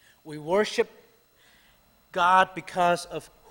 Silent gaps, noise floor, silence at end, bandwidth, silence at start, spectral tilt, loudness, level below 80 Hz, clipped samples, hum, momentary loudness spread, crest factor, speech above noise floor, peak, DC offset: none; -61 dBFS; 0.25 s; 16.5 kHz; 0.25 s; -4 dB/octave; -25 LUFS; -64 dBFS; under 0.1%; none; 19 LU; 20 dB; 36 dB; -6 dBFS; under 0.1%